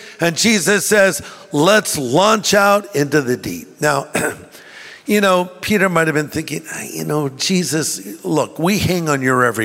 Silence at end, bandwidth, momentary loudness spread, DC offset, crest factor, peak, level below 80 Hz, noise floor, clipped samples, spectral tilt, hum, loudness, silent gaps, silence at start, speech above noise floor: 0 s; 16.5 kHz; 12 LU; under 0.1%; 16 dB; -2 dBFS; -50 dBFS; -38 dBFS; under 0.1%; -4 dB/octave; none; -16 LUFS; none; 0 s; 22 dB